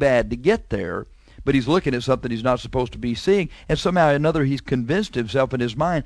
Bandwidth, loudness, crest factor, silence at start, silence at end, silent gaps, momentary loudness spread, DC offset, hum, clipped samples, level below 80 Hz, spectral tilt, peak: 11 kHz; -21 LUFS; 16 dB; 0 s; 0 s; none; 8 LU; under 0.1%; none; under 0.1%; -40 dBFS; -6.5 dB/octave; -6 dBFS